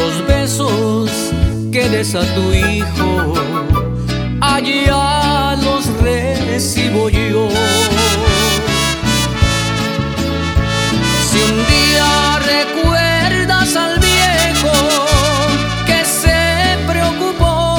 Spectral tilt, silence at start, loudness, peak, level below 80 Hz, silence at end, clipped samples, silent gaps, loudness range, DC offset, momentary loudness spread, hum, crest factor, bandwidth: -4 dB/octave; 0 s; -13 LUFS; 0 dBFS; -22 dBFS; 0 s; under 0.1%; none; 3 LU; under 0.1%; 5 LU; none; 14 dB; over 20 kHz